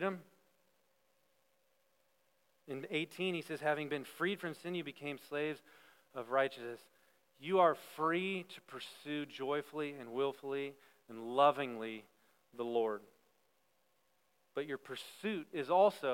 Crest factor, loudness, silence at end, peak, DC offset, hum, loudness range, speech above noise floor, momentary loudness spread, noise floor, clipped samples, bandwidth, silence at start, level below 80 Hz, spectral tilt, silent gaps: 24 dB; -37 LUFS; 0 s; -16 dBFS; under 0.1%; none; 7 LU; 41 dB; 18 LU; -78 dBFS; under 0.1%; 16.5 kHz; 0 s; under -90 dBFS; -5.5 dB/octave; none